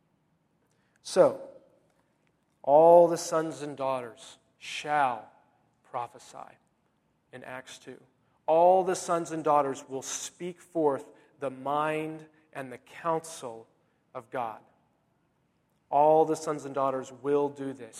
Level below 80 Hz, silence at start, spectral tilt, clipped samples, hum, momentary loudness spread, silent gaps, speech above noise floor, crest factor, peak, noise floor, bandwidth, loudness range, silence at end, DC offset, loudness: -78 dBFS; 1.05 s; -4.5 dB/octave; under 0.1%; none; 22 LU; none; 45 dB; 22 dB; -6 dBFS; -72 dBFS; 13.5 kHz; 13 LU; 0 s; under 0.1%; -27 LUFS